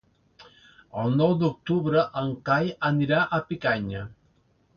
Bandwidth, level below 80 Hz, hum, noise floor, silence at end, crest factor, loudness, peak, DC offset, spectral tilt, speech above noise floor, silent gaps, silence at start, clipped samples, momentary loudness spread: 6.8 kHz; -56 dBFS; none; -64 dBFS; 0.65 s; 18 dB; -25 LUFS; -8 dBFS; under 0.1%; -8.5 dB/octave; 40 dB; none; 0.4 s; under 0.1%; 10 LU